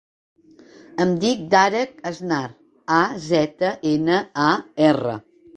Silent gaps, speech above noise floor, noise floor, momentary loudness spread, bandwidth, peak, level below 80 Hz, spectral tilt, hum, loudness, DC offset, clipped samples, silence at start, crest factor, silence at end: none; 28 dB; -48 dBFS; 12 LU; 9.4 kHz; -2 dBFS; -60 dBFS; -5.5 dB/octave; none; -20 LUFS; under 0.1%; under 0.1%; 0.95 s; 20 dB; 0.4 s